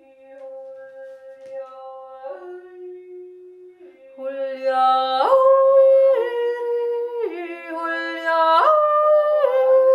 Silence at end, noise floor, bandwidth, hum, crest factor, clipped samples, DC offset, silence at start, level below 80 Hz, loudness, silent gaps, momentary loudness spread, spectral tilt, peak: 0 s; -45 dBFS; 5.2 kHz; none; 16 dB; under 0.1%; under 0.1%; 0.3 s; -78 dBFS; -18 LUFS; none; 25 LU; -3 dB/octave; -4 dBFS